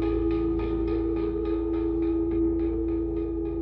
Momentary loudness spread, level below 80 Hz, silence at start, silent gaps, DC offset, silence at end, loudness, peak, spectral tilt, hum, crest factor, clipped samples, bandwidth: 3 LU; -36 dBFS; 0 s; none; under 0.1%; 0 s; -27 LUFS; -16 dBFS; -11 dB/octave; none; 10 dB; under 0.1%; 4.4 kHz